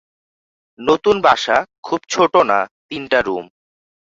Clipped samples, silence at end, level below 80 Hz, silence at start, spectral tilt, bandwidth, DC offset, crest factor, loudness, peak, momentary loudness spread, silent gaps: under 0.1%; 0.7 s; -54 dBFS; 0.8 s; -3.5 dB/octave; 8 kHz; under 0.1%; 18 dB; -17 LUFS; -2 dBFS; 11 LU; 1.78-1.83 s, 2.71-2.89 s